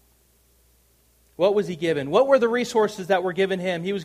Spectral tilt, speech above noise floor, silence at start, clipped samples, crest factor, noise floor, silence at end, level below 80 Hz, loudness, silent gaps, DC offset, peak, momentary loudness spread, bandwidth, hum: -5.5 dB/octave; 39 dB; 1.4 s; under 0.1%; 18 dB; -61 dBFS; 0 s; -64 dBFS; -22 LUFS; none; under 0.1%; -6 dBFS; 7 LU; 15 kHz; none